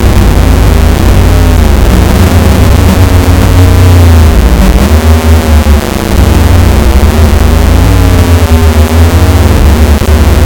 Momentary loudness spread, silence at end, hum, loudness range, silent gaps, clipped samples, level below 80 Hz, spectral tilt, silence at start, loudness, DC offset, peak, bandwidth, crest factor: 2 LU; 0 s; none; 1 LU; none; 30%; -6 dBFS; -6 dB/octave; 0 s; -5 LUFS; under 0.1%; 0 dBFS; 18 kHz; 4 dB